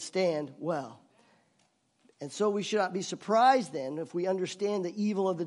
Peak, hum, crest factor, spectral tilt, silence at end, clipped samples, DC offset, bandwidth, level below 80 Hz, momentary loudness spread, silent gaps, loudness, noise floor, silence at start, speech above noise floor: -10 dBFS; none; 20 dB; -5 dB/octave; 0 s; under 0.1%; under 0.1%; 11.5 kHz; -86 dBFS; 12 LU; none; -30 LUFS; -71 dBFS; 0 s; 42 dB